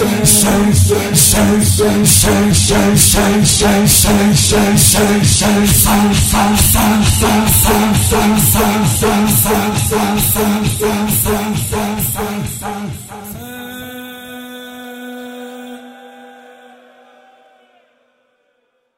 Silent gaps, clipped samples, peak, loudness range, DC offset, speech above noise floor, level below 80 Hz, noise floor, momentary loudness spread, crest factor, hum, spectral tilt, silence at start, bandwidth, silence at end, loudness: none; under 0.1%; 0 dBFS; 20 LU; under 0.1%; 52 dB; -26 dBFS; -63 dBFS; 20 LU; 12 dB; none; -4 dB/octave; 0 s; 16.5 kHz; 2.7 s; -11 LUFS